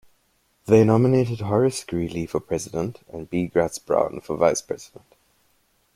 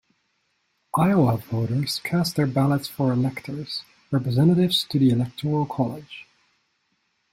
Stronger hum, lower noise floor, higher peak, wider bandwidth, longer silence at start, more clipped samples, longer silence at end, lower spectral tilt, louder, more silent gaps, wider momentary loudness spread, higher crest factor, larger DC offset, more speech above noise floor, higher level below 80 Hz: neither; second, -66 dBFS vs -71 dBFS; about the same, -4 dBFS vs -6 dBFS; about the same, 15 kHz vs 16 kHz; second, 0.65 s vs 0.95 s; neither; about the same, 1.1 s vs 1.1 s; about the same, -6.5 dB/octave vs -6.5 dB/octave; about the same, -22 LUFS vs -23 LUFS; neither; about the same, 13 LU vs 12 LU; about the same, 20 dB vs 16 dB; neither; second, 44 dB vs 49 dB; about the same, -54 dBFS vs -58 dBFS